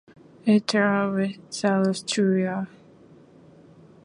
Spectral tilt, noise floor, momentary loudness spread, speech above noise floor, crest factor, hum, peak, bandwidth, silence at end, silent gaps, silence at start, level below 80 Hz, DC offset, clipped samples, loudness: -5.5 dB/octave; -51 dBFS; 8 LU; 29 dB; 18 dB; none; -8 dBFS; 11 kHz; 1.4 s; none; 0.45 s; -70 dBFS; under 0.1%; under 0.1%; -24 LUFS